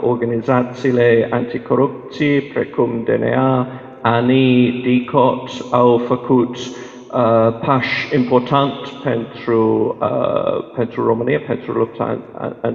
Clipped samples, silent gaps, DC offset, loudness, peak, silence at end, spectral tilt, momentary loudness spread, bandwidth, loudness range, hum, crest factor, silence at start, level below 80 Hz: under 0.1%; none; under 0.1%; -17 LUFS; 0 dBFS; 0 s; -7.5 dB/octave; 9 LU; 7.2 kHz; 3 LU; none; 16 dB; 0 s; -54 dBFS